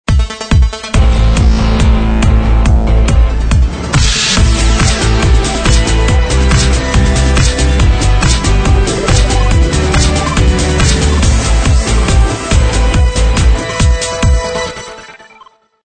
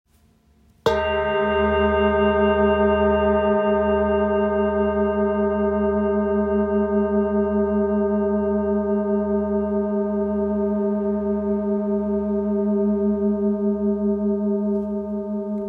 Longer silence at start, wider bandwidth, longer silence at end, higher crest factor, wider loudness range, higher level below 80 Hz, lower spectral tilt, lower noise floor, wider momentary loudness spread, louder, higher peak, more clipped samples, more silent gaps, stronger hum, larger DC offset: second, 0.1 s vs 0.85 s; first, 9.4 kHz vs 5.4 kHz; first, 0.75 s vs 0 s; second, 10 dB vs 16 dB; about the same, 1 LU vs 3 LU; first, -12 dBFS vs -40 dBFS; second, -4.5 dB/octave vs -8.5 dB/octave; second, -42 dBFS vs -58 dBFS; second, 2 LU vs 5 LU; first, -11 LUFS vs -21 LUFS; first, 0 dBFS vs -6 dBFS; neither; neither; neither; neither